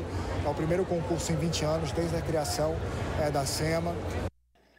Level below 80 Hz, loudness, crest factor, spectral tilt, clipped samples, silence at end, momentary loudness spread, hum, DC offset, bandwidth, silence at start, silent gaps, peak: -44 dBFS; -30 LUFS; 14 dB; -5.5 dB/octave; under 0.1%; 0.5 s; 5 LU; none; under 0.1%; 16 kHz; 0 s; none; -16 dBFS